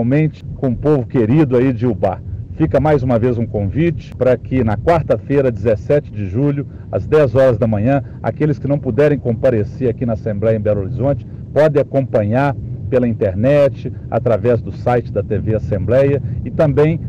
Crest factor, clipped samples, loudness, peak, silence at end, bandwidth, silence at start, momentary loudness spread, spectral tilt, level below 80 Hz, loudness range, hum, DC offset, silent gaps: 10 dB; under 0.1%; -16 LUFS; -6 dBFS; 0 s; 7.8 kHz; 0 s; 7 LU; -10 dB/octave; -36 dBFS; 1 LU; none; under 0.1%; none